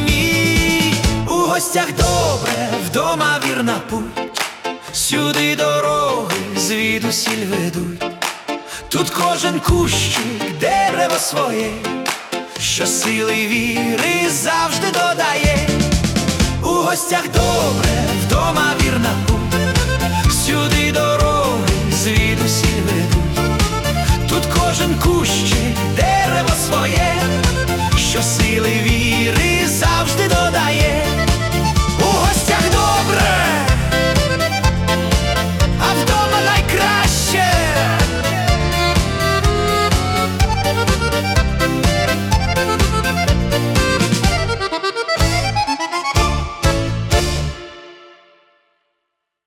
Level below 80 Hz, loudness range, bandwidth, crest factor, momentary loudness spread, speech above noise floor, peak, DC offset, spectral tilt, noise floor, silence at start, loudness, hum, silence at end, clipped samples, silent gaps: -26 dBFS; 3 LU; 18 kHz; 14 dB; 5 LU; 59 dB; -2 dBFS; under 0.1%; -4 dB/octave; -75 dBFS; 0 s; -16 LUFS; none; 1.4 s; under 0.1%; none